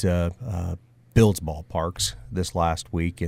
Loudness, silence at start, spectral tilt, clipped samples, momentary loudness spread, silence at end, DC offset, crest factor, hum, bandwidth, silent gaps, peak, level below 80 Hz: -25 LUFS; 0 s; -5.5 dB/octave; under 0.1%; 11 LU; 0 s; under 0.1%; 20 dB; none; 16 kHz; none; -6 dBFS; -38 dBFS